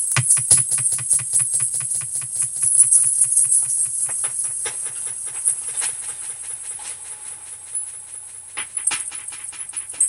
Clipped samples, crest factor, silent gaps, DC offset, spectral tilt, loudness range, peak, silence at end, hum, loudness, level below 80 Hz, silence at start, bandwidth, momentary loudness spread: under 0.1%; 22 dB; none; under 0.1%; 0 dB/octave; 11 LU; 0 dBFS; 0 s; none; -18 LUFS; -62 dBFS; 0 s; 17 kHz; 17 LU